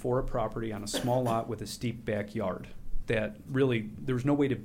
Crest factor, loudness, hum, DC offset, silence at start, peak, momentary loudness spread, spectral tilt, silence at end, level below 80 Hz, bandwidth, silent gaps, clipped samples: 14 dB; -32 LUFS; none; under 0.1%; 0 s; -16 dBFS; 8 LU; -6 dB/octave; 0 s; -44 dBFS; 16 kHz; none; under 0.1%